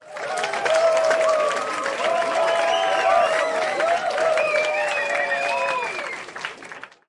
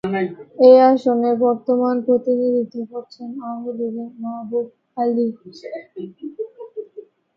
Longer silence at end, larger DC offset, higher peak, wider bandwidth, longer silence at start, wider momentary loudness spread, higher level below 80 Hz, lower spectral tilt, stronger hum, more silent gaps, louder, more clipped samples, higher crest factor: second, 0.2 s vs 0.35 s; neither; second, -6 dBFS vs 0 dBFS; first, 11.5 kHz vs 5.8 kHz; about the same, 0.05 s vs 0.05 s; second, 11 LU vs 21 LU; about the same, -66 dBFS vs -68 dBFS; second, -1.5 dB/octave vs -8 dB/octave; neither; neither; second, -21 LUFS vs -18 LUFS; neither; about the same, 16 dB vs 18 dB